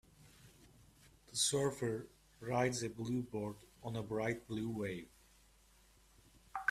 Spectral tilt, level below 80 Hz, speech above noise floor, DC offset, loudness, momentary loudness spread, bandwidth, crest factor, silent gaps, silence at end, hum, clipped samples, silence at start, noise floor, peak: -4 dB/octave; -68 dBFS; 28 dB; under 0.1%; -40 LUFS; 15 LU; 15.5 kHz; 22 dB; none; 0 s; none; under 0.1%; 0.2 s; -67 dBFS; -20 dBFS